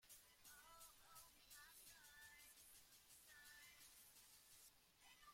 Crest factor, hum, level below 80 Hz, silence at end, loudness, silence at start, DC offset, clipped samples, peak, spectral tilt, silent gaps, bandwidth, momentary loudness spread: 16 dB; none; -84 dBFS; 0 s; -65 LUFS; 0 s; under 0.1%; under 0.1%; -52 dBFS; 0 dB/octave; none; 16.5 kHz; 4 LU